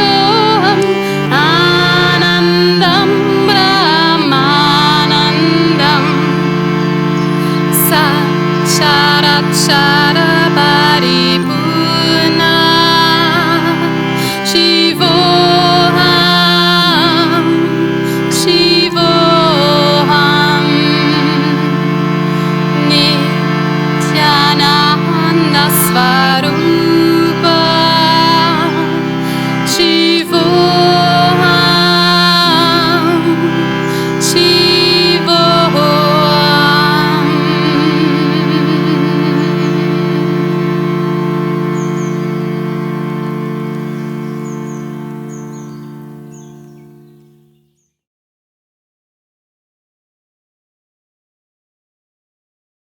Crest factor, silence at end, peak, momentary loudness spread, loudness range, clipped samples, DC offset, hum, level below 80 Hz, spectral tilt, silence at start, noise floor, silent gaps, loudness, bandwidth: 10 dB; 6.25 s; 0 dBFS; 8 LU; 7 LU; under 0.1%; under 0.1%; none; -46 dBFS; -4.5 dB/octave; 0 s; -59 dBFS; none; -10 LUFS; 19 kHz